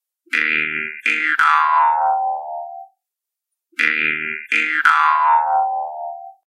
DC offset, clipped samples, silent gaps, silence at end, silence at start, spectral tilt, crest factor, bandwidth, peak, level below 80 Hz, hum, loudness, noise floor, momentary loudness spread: under 0.1%; under 0.1%; none; 0.15 s; 0.3 s; -2 dB/octave; 18 dB; 12.5 kHz; 0 dBFS; under -90 dBFS; none; -17 LUFS; -84 dBFS; 15 LU